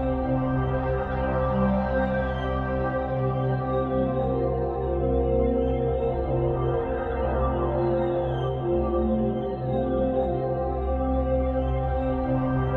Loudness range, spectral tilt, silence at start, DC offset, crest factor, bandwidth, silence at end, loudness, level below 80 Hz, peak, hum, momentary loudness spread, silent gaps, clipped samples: 1 LU; -10.5 dB/octave; 0 s; under 0.1%; 12 dB; 4.4 kHz; 0 s; -26 LUFS; -32 dBFS; -12 dBFS; none; 3 LU; none; under 0.1%